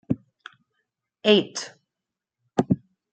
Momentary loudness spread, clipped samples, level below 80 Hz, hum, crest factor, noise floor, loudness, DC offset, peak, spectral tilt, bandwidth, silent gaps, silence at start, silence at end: 14 LU; under 0.1%; -62 dBFS; none; 24 dB; -87 dBFS; -24 LUFS; under 0.1%; -4 dBFS; -5 dB/octave; 9 kHz; none; 0.1 s; 0.35 s